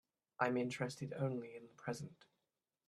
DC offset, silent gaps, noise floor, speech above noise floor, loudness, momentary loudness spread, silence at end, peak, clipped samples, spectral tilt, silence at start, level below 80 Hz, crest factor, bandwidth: under 0.1%; none; under -90 dBFS; over 49 dB; -42 LUFS; 12 LU; 0.75 s; -20 dBFS; under 0.1%; -6 dB/octave; 0.4 s; -82 dBFS; 24 dB; 13 kHz